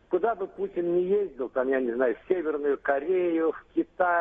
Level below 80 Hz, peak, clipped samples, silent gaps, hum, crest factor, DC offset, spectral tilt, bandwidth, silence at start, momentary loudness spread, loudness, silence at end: -62 dBFS; -10 dBFS; under 0.1%; none; none; 16 dB; under 0.1%; -9 dB/octave; 3.8 kHz; 0.1 s; 6 LU; -27 LUFS; 0 s